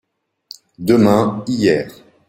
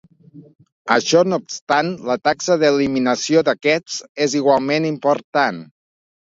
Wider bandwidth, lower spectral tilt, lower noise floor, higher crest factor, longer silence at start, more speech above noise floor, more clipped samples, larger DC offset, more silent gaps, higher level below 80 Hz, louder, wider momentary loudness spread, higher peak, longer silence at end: first, 16.5 kHz vs 7.8 kHz; first, -6.5 dB/octave vs -4 dB/octave; about the same, -43 dBFS vs -45 dBFS; about the same, 16 dB vs 18 dB; first, 0.8 s vs 0.35 s; about the same, 28 dB vs 27 dB; neither; neither; second, none vs 0.72-0.85 s, 1.61-1.67 s, 4.09-4.15 s, 5.24-5.33 s; first, -52 dBFS vs -62 dBFS; about the same, -16 LUFS vs -18 LUFS; first, 11 LU vs 6 LU; about the same, -2 dBFS vs 0 dBFS; second, 0.4 s vs 0.7 s